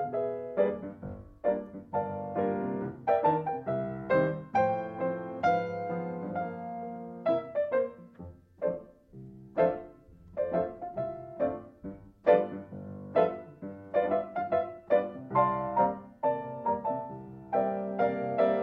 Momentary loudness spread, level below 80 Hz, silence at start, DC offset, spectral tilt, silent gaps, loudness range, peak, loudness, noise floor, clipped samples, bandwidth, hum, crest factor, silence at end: 15 LU; -62 dBFS; 0 s; under 0.1%; -9 dB/octave; none; 5 LU; -10 dBFS; -31 LUFS; -53 dBFS; under 0.1%; 6.2 kHz; none; 22 dB; 0 s